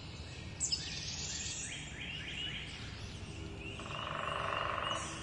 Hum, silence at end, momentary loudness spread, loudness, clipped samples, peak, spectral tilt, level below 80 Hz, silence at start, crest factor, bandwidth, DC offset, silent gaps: none; 0 s; 10 LU; -39 LUFS; under 0.1%; -22 dBFS; -2.5 dB/octave; -54 dBFS; 0 s; 18 dB; 11.5 kHz; under 0.1%; none